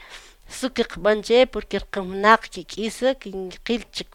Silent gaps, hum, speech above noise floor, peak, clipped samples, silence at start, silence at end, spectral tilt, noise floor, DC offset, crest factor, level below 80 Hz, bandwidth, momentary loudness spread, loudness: none; none; 22 dB; 0 dBFS; under 0.1%; 0 s; 0.1 s; -4 dB/octave; -44 dBFS; under 0.1%; 22 dB; -46 dBFS; 15.5 kHz; 15 LU; -22 LUFS